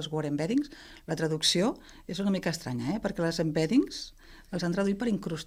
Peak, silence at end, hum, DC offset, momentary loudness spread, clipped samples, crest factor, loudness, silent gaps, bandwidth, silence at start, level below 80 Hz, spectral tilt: -12 dBFS; 0 s; none; under 0.1%; 14 LU; under 0.1%; 18 dB; -30 LUFS; none; 16 kHz; 0 s; -54 dBFS; -5 dB/octave